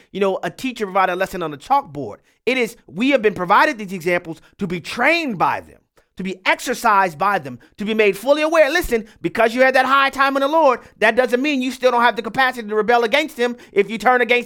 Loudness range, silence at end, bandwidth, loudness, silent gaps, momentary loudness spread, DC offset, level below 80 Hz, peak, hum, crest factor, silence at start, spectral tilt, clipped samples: 4 LU; 0 s; 18 kHz; -18 LUFS; none; 11 LU; under 0.1%; -48 dBFS; 0 dBFS; none; 18 dB; 0.15 s; -4 dB/octave; under 0.1%